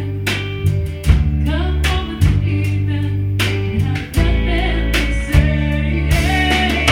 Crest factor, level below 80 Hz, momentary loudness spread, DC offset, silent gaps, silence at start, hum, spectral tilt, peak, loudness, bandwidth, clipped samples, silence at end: 16 dB; -20 dBFS; 5 LU; under 0.1%; none; 0 s; none; -5.5 dB/octave; 0 dBFS; -17 LUFS; 16.5 kHz; under 0.1%; 0 s